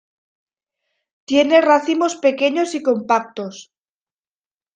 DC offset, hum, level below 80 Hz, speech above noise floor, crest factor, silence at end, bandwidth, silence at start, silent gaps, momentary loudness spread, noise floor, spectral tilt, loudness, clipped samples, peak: under 0.1%; none; -68 dBFS; over 73 dB; 18 dB; 1.15 s; 9.6 kHz; 1.3 s; none; 13 LU; under -90 dBFS; -3.5 dB/octave; -17 LUFS; under 0.1%; -2 dBFS